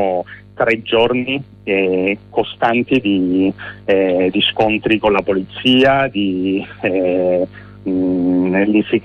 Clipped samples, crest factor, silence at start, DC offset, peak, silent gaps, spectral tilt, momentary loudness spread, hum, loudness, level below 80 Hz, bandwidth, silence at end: under 0.1%; 14 dB; 0 s; under 0.1%; -2 dBFS; none; -7.5 dB/octave; 7 LU; none; -16 LUFS; -48 dBFS; 6.4 kHz; 0 s